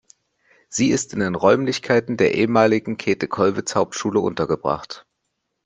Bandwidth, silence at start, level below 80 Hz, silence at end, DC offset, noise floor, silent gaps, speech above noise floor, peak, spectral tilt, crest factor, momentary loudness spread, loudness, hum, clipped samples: 10 kHz; 0.7 s; -56 dBFS; 0.65 s; under 0.1%; -76 dBFS; none; 56 dB; -2 dBFS; -5 dB/octave; 18 dB; 7 LU; -20 LUFS; none; under 0.1%